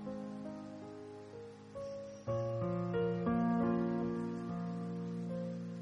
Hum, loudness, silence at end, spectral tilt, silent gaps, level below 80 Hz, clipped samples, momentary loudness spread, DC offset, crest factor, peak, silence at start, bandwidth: none; -38 LUFS; 0 s; -9 dB/octave; none; -64 dBFS; under 0.1%; 16 LU; under 0.1%; 16 dB; -24 dBFS; 0 s; 8 kHz